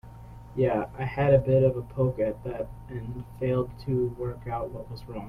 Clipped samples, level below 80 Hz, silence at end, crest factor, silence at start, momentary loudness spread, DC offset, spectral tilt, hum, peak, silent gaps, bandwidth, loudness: under 0.1%; -46 dBFS; 0 s; 18 dB; 0.05 s; 16 LU; under 0.1%; -9.5 dB/octave; none; -8 dBFS; none; 5.2 kHz; -28 LUFS